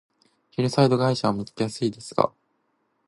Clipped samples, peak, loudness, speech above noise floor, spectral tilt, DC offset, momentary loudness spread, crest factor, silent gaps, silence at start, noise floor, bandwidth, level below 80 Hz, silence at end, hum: under 0.1%; -2 dBFS; -24 LUFS; 48 dB; -6.5 dB/octave; under 0.1%; 9 LU; 24 dB; none; 0.6 s; -71 dBFS; 11.5 kHz; -62 dBFS; 0.8 s; none